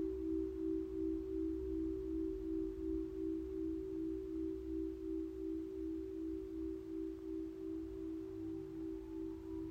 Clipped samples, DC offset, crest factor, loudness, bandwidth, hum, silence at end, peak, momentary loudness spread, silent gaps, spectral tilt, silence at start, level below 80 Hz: under 0.1%; under 0.1%; 12 dB; -43 LUFS; 6.8 kHz; none; 0 s; -30 dBFS; 5 LU; none; -9 dB/octave; 0 s; -54 dBFS